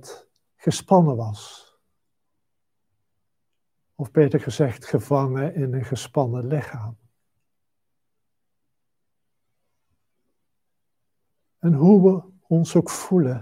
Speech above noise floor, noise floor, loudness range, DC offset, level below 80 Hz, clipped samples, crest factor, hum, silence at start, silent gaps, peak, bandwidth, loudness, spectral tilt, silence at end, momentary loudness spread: 63 dB; -83 dBFS; 10 LU; under 0.1%; -66 dBFS; under 0.1%; 20 dB; none; 0.05 s; none; -4 dBFS; 15 kHz; -21 LUFS; -7.5 dB/octave; 0 s; 13 LU